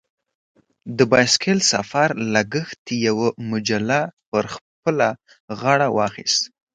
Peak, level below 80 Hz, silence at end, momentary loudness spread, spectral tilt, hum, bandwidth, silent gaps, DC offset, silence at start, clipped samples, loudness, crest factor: 0 dBFS; -60 dBFS; 0.25 s; 11 LU; -3.5 dB/octave; none; 9.6 kHz; 2.78-2.85 s, 4.13-4.17 s, 4.26-4.32 s, 4.61-4.83 s, 5.40-5.48 s; under 0.1%; 0.85 s; under 0.1%; -20 LUFS; 20 dB